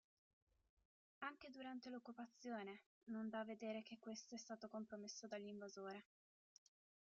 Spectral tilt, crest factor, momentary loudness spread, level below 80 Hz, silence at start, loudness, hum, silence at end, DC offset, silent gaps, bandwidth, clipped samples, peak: -3.5 dB/octave; 18 dB; 6 LU; under -90 dBFS; 1.2 s; -54 LUFS; none; 1 s; under 0.1%; 2.86-3.01 s; 7.4 kHz; under 0.1%; -36 dBFS